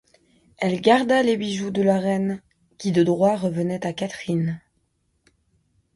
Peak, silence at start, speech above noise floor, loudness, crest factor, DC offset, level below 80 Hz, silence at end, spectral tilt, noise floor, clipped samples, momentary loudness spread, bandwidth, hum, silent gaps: -4 dBFS; 0.6 s; 48 dB; -22 LUFS; 20 dB; under 0.1%; -62 dBFS; 1.4 s; -6.5 dB/octave; -69 dBFS; under 0.1%; 11 LU; 11.5 kHz; none; none